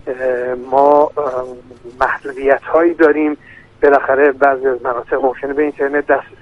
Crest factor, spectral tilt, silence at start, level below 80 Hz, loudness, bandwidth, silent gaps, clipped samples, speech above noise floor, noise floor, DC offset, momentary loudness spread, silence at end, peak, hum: 14 dB; -7 dB/octave; 0.05 s; -48 dBFS; -15 LUFS; 6.4 kHz; none; under 0.1%; 19 dB; -33 dBFS; under 0.1%; 9 LU; 0.2 s; 0 dBFS; none